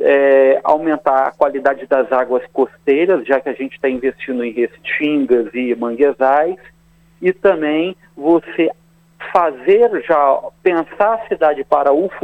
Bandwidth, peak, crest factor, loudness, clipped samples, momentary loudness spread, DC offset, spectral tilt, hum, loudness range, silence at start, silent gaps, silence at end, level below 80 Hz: 5 kHz; 0 dBFS; 16 dB; -16 LUFS; under 0.1%; 8 LU; under 0.1%; -7 dB/octave; none; 3 LU; 0 s; none; 0.05 s; -56 dBFS